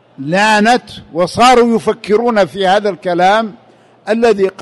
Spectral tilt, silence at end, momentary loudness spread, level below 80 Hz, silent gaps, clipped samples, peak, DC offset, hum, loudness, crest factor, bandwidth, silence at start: -4.5 dB/octave; 0 s; 9 LU; -46 dBFS; none; under 0.1%; 0 dBFS; under 0.1%; none; -12 LUFS; 12 dB; 12 kHz; 0.2 s